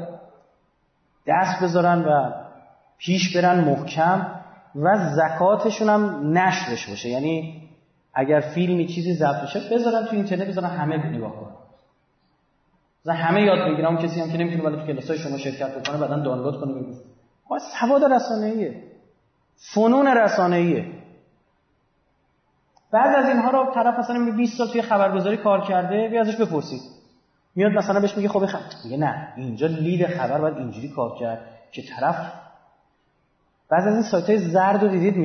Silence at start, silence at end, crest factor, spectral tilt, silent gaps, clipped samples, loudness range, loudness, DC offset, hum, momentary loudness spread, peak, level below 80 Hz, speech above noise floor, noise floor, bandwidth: 0 s; 0 s; 14 dB; -6.5 dB/octave; none; under 0.1%; 6 LU; -22 LUFS; under 0.1%; none; 13 LU; -8 dBFS; -68 dBFS; 45 dB; -66 dBFS; 6.6 kHz